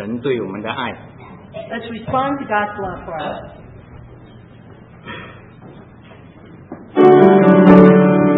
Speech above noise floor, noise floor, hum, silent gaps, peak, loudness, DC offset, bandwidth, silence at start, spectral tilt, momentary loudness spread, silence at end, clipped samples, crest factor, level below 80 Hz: 18 dB; -41 dBFS; none; none; 0 dBFS; -13 LUFS; under 0.1%; 4 kHz; 0 s; -10 dB/octave; 25 LU; 0 s; 0.2%; 16 dB; -46 dBFS